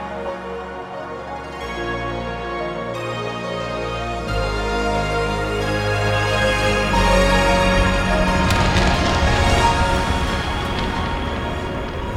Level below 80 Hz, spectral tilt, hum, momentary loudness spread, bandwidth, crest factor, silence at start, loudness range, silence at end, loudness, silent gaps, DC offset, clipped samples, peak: -26 dBFS; -5 dB/octave; none; 12 LU; 16 kHz; 18 dB; 0 s; 9 LU; 0 s; -20 LUFS; none; under 0.1%; under 0.1%; -2 dBFS